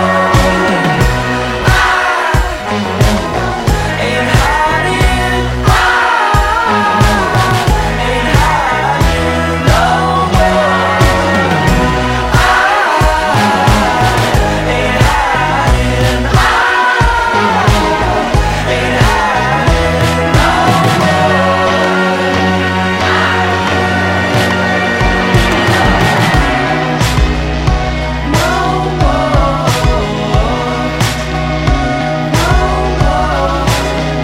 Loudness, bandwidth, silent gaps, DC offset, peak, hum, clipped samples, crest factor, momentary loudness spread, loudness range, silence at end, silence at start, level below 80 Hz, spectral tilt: -11 LUFS; 16.5 kHz; none; under 0.1%; 0 dBFS; none; under 0.1%; 10 dB; 4 LU; 3 LU; 0 s; 0 s; -18 dBFS; -5 dB/octave